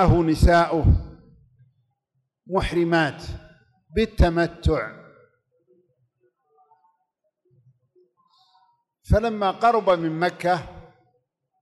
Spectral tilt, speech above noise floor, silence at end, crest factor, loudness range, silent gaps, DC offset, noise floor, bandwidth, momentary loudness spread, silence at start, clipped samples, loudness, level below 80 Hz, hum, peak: -7 dB/octave; 56 dB; 0.8 s; 16 dB; 8 LU; none; under 0.1%; -76 dBFS; 12 kHz; 15 LU; 0 s; under 0.1%; -22 LUFS; -32 dBFS; none; -8 dBFS